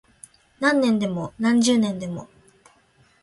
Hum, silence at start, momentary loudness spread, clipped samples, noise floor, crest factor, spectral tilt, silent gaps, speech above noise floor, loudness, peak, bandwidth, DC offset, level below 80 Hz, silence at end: none; 0.6 s; 13 LU; under 0.1%; -59 dBFS; 20 dB; -4.5 dB/octave; none; 38 dB; -21 LUFS; -4 dBFS; 11.5 kHz; under 0.1%; -60 dBFS; 1 s